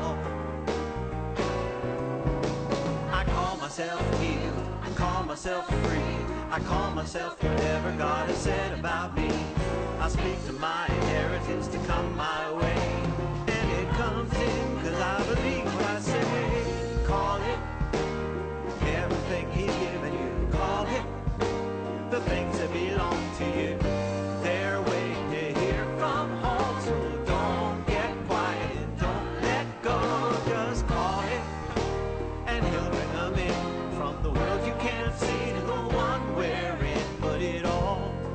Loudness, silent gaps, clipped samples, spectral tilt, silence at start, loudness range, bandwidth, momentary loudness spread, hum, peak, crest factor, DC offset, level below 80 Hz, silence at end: -29 LUFS; none; under 0.1%; -6 dB/octave; 0 s; 2 LU; 9 kHz; 4 LU; none; -14 dBFS; 14 dB; under 0.1%; -36 dBFS; 0 s